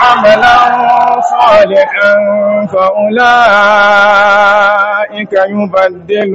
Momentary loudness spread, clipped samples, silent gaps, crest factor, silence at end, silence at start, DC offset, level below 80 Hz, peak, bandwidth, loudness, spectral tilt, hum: 6 LU; 1%; none; 8 dB; 0 s; 0 s; under 0.1%; -44 dBFS; 0 dBFS; 8 kHz; -7 LUFS; -4.5 dB/octave; none